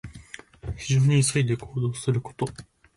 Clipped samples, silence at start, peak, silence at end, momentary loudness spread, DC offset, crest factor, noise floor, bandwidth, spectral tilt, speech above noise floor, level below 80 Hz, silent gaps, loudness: under 0.1%; 0.05 s; -12 dBFS; 0.35 s; 20 LU; under 0.1%; 14 dB; -45 dBFS; 11.5 kHz; -5.5 dB/octave; 22 dB; -48 dBFS; none; -25 LUFS